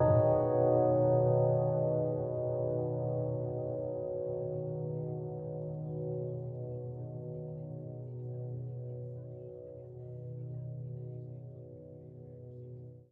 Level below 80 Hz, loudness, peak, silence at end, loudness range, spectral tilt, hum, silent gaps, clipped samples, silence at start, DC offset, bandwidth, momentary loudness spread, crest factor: -62 dBFS; -34 LUFS; -16 dBFS; 0.1 s; 15 LU; -13 dB/octave; none; none; under 0.1%; 0 s; under 0.1%; 2.1 kHz; 20 LU; 18 dB